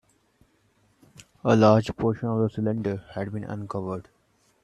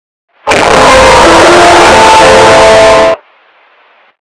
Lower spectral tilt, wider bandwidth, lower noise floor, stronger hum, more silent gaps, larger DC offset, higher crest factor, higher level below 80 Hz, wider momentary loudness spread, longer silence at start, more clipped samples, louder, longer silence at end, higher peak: first, -8 dB/octave vs -3 dB/octave; second, 9.6 kHz vs 11 kHz; first, -66 dBFS vs -44 dBFS; neither; neither; neither; first, 22 dB vs 4 dB; second, -58 dBFS vs -26 dBFS; first, 15 LU vs 8 LU; first, 1.2 s vs 0.45 s; second, under 0.1% vs 1%; second, -25 LUFS vs -2 LUFS; second, 0.6 s vs 1.1 s; second, -4 dBFS vs 0 dBFS